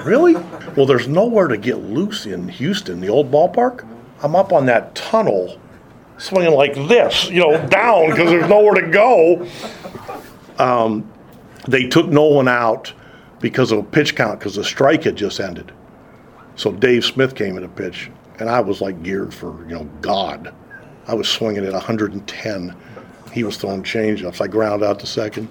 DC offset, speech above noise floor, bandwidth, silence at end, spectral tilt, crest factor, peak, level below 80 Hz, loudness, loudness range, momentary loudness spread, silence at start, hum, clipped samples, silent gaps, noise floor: under 0.1%; 27 dB; 18.5 kHz; 0 s; -5.5 dB/octave; 16 dB; 0 dBFS; -52 dBFS; -16 LUFS; 9 LU; 17 LU; 0 s; none; under 0.1%; none; -43 dBFS